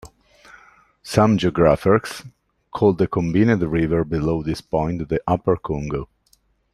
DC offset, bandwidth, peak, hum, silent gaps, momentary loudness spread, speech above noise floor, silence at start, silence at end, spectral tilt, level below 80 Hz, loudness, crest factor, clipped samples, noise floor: under 0.1%; 14 kHz; 0 dBFS; none; none; 11 LU; 42 dB; 0.05 s; 0.7 s; -7.5 dB/octave; -42 dBFS; -20 LUFS; 20 dB; under 0.1%; -61 dBFS